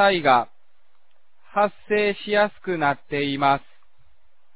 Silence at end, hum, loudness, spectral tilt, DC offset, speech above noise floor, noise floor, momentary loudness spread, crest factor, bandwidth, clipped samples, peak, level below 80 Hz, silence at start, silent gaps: 0.95 s; none; -22 LUFS; -8.5 dB/octave; 0.7%; 48 dB; -69 dBFS; 7 LU; 20 dB; 4 kHz; under 0.1%; -4 dBFS; -60 dBFS; 0 s; none